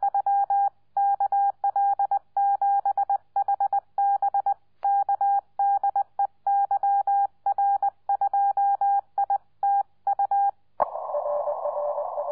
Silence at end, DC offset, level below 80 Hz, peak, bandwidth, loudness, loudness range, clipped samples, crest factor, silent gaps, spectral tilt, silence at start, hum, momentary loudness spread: 0 s; 0.1%; -70 dBFS; -8 dBFS; 2 kHz; -25 LUFS; 1 LU; under 0.1%; 16 dB; none; -7 dB/octave; 0 s; none; 5 LU